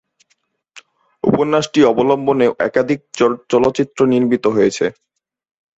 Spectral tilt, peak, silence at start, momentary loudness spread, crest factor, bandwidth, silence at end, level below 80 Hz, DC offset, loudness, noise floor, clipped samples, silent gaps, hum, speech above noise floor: -6 dB/octave; 0 dBFS; 0.75 s; 5 LU; 16 dB; 8.2 kHz; 0.85 s; -54 dBFS; under 0.1%; -16 LUFS; -65 dBFS; under 0.1%; none; none; 50 dB